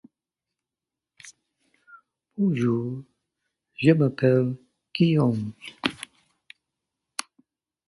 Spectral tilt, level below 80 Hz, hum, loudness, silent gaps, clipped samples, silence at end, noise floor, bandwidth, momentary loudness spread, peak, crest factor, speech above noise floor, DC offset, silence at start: -7 dB/octave; -64 dBFS; none; -24 LUFS; none; under 0.1%; 1.85 s; -89 dBFS; 11.5 kHz; 19 LU; -4 dBFS; 24 dB; 67 dB; under 0.1%; 1.25 s